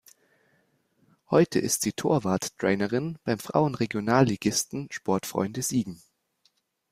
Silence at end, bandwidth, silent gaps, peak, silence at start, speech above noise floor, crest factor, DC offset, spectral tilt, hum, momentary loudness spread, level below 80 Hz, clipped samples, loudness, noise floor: 0.95 s; 16 kHz; none; -6 dBFS; 1.3 s; 44 dB; 22 dB; under 0.1%; -5 dB/octave; none; 7 LU; -62 dBFS; under 0.1%; -26 LUFS; -70 dBFS